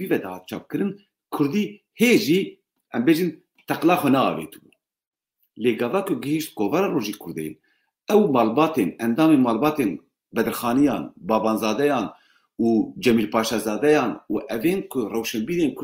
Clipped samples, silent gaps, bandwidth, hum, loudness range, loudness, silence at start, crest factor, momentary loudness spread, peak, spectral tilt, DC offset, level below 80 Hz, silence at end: under 0.1%; 5.07-5.12 s; 16 kHz; none; 3 LU; -22 LUFS; 0 s; 16 dB; 13 LU; -6 dBFS; -5.5 dB/octave; under 0.1%; -60 dBFS; 0 s